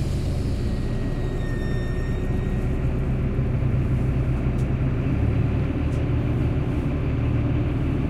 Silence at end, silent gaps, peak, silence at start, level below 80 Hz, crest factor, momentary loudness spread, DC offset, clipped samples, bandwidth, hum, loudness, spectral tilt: 0 s; none; -12 dBFS; 0 s; -28 dBFS; 12 dB; 4 LU; under 0.1%; under 0.1%; 11.5 kHz; none; -25 LUFS; -8.5 dB/octave